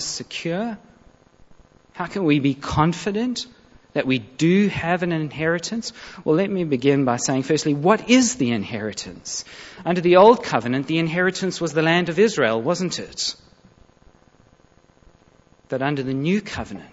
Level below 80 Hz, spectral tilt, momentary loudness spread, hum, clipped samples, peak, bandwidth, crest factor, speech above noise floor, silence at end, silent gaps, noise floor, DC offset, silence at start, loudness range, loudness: -52 dBFS; -5 dB/octave; 14 LU; none; under 0.1%; -2 dBFS; 8 kHz; 20 dB; 35 dB; 0.05 s; none; -55 dBFS; under 0.1%; 0 s; 10 LU; -21 LUFS